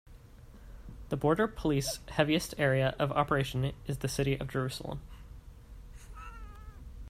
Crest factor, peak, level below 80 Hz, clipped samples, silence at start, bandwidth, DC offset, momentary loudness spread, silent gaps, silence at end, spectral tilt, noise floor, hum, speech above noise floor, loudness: 22 dB; -12 dBFS; -48 dBFS; under 0.1%; 0.05 s; 15.5 kHz; under 0.1%; 23 LU; none; 0 s; -5.5 dB/octave; -52 dBFS; none; 21 dB; -31 LUFS